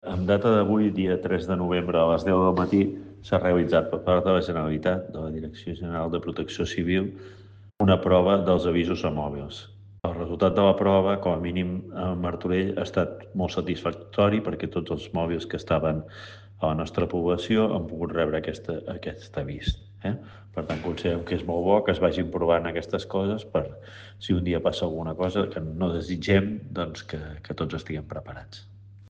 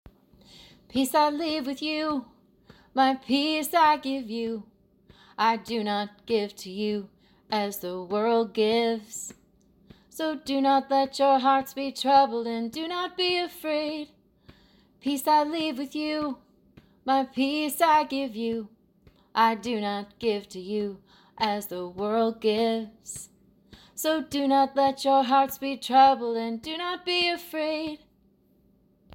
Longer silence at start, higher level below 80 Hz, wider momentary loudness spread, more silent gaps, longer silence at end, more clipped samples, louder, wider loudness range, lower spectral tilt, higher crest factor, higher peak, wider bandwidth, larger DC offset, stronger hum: second, 0.05 s vs 0.6 s; first, -48 dBFS vs -66 dBFS; about the same, 14 LU vs 13 LU; neither; second, 0 s vs 1.2 s; neither; about the same, -26 LUFS vs -26 LUFS; about the same, 6 LU vs 6 LU; first, -7.5 dB/octave vs -3.5 dB/octave; about the same, 18 dB vs 20 dB; about the same, -6 dBFS vs -8 dBFS; second, 8.2 kHz vs 17 kHz; neither; neither